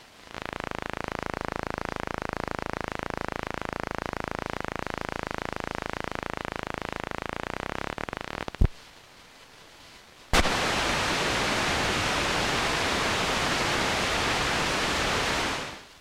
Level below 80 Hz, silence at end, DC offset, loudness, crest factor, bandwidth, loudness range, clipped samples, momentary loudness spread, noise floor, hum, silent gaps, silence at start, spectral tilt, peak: -40 dBFS; 0 s; under 0.1%; -28 LUFS; 22 dB; 16.5 kHz; 9 LU; under 0.1%; 10 LU; -51 dBFS; none; none; 0 s; -3 dB/octave; -8 dBFS